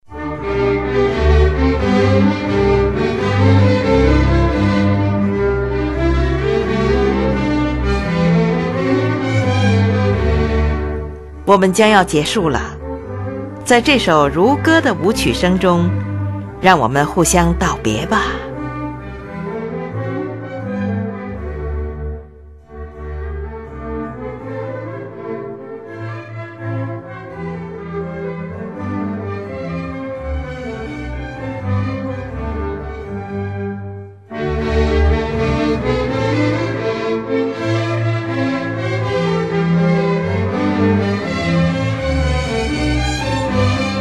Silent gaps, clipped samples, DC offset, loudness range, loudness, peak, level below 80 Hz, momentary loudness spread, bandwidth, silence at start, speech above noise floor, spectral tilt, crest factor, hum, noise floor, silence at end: none; under 0.1%; under 0.1%; 13 LU; -17 LUFS; 0 dBFS; -26 dBFS; 14 LU; 13 kHz; 0.1 s; 26 dB; -6 dB/octave; 16 dB; none; -39 dBFS; 0 s